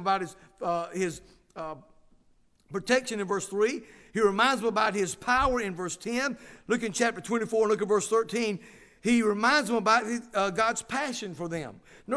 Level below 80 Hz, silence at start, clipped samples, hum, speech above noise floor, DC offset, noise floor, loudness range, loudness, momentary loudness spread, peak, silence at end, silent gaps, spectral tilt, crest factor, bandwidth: -54 dBFS; 0 s; under 0.1%; none; 36 dB; under 0.1%; -64 dBFS; 6 LU; -28 LUFS; 15 LU; -8 dBFS; 0 s; none; -3.5 dB/octave; 20 dB; 11 kHz